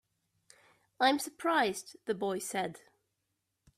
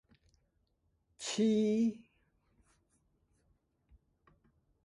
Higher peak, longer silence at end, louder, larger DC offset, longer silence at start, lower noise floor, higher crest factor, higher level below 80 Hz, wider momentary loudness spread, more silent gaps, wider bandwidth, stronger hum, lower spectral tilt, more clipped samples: first, -14 dBFS vs -20 dBFS; second, 1 s vs 2.9 s; about the same, -33 LUFS vs -32 LUFS; neither; second, 1 s vs 1.2 s; first, -83 dBFS vs -78 dBFS; about the same, 22 dB vs 18 dB; about the same, -78 dBFS vs -74 dBFS; about the same, 10 LU vs 10 LU; neither; first, 15.5 kHz vs 11.5 kHz; neither; second, -3 dB/octave vs -5 dB/octave; neither